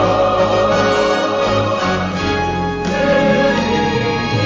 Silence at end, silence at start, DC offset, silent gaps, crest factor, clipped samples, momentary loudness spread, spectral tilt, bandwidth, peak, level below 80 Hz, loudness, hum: 0 s; 0 s; under 0.1%; none; 10 dB; under 0.1%; 4 LU; -5.5 dB/octave; 7.8 kHz; -6 dBFS; -34 dBFS; -15 LUFS; none